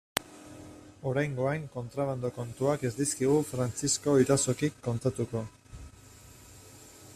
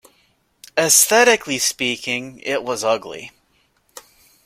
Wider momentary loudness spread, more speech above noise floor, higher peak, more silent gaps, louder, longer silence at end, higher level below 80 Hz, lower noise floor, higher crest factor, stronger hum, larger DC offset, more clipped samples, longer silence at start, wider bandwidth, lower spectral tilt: first, 24 LU vs 13 LU; second, 24 dB vs 44 dB; second, -4 dBFS vs 0 dBFS; neither; second, -30 LUFS vs -17 LUFS; second, 0 s vs 1.15 s; about the same, -58 dBFS vs -62 dBFS; second, -53 dBFS vs -62 dBFS; first, 28 dB vs 20 dB; neither; neither; neither; second, 0.15 s vs 0.75 s; about the same, 15.5 kHz vs 16.5 kHz; first, -5 dB/octave vs -1 dB/octave